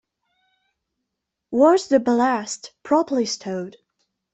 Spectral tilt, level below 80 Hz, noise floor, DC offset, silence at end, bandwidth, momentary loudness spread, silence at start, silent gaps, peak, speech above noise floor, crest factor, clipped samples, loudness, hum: -4 dB/octave; -66 dBFS; -81 dBFS; under 0.1%; 0.65 s; 8.4 kHz; 15 LU; 1.5 s; none; -4 dBFS; 62 dB; 18 dB; under 0.1%; -20 LUFS; none